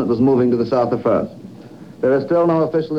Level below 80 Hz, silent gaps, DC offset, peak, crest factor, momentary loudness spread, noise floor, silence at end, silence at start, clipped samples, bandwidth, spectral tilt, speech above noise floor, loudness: -54 dBFS; none; 0.2%; -4 dBFS; 12 dB; 7 LU; -38 dBFS; 0 s; 0 s; under 0.1%; 7.4 kHz; -9.5 dB/octave; 22 dB; -17 LUFS